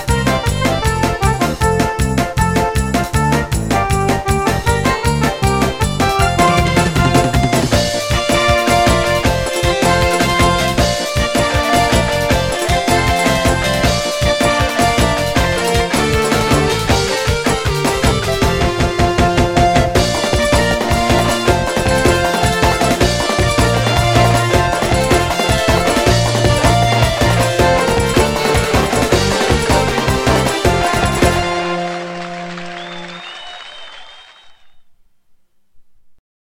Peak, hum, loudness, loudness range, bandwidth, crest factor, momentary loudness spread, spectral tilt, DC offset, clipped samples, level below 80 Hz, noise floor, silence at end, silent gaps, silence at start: 0 dBFS; none; -14 LUFS; 3 LU; 16.5 kHz; 14 dB; 4 LU; -4.5 dB/octave; under 0.1%; under 0.1%; -24 dBFS; -50 dBFS; 0.35 s; none; 0 s